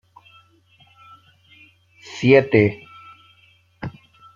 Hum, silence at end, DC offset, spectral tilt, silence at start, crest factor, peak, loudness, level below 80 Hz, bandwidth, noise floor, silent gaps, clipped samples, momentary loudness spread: none; 0.45 s; under 0.1%; -7 dB/octave; 2.1 s; 22 dB; 0 dBFS; -17 LUFS; -60 dBFS; 7.4 kHz; -56 dBFS; none; under 0.1%; 24 LU